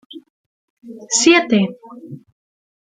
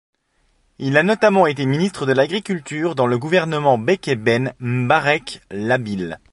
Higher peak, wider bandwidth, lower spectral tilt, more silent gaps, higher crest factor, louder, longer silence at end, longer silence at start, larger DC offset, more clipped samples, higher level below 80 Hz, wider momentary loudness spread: about the same, 0 dBFS vs -2 dBFS; second, 9.6 kHz vs 11.5 kHz; second, -3 dB/octave vs -6 dB/octave; first, 0.30-0.77 s vs none; about the same, 20 dB vs 18 dB; first, -14 LUFS vs -18 LUFS; first, 0.7 s vs 0.15 s; second, 0.15 s vs 0.8 s; neither; neither; second, -64 dBFS vs -56 dBFS; first, 26 LU vs 10 LU